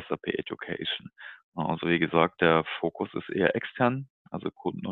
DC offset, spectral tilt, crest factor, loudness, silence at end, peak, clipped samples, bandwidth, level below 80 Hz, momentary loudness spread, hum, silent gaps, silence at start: under 0.1%; -9.5 dB/octave; 22 dB; -28 LUFS; 0 s; -6 dBFS; under 0.1%; 4.4 kHz; -62 dBFS; 13 LU; none; 1.43-1.52 s, 4.10-4.25 s; 0 s